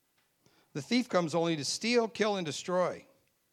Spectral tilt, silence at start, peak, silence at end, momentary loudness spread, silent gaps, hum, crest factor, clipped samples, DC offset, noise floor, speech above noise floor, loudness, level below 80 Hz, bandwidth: -4 dB/octave; 0.75 s; -14 dBFS; 0.5 s; 10 LU; none; none; 20 dB; under 0.1%; under 0.1%; -71 dBFS; 40 dB; -31 LUFS; -80 dBFS; 14 kHz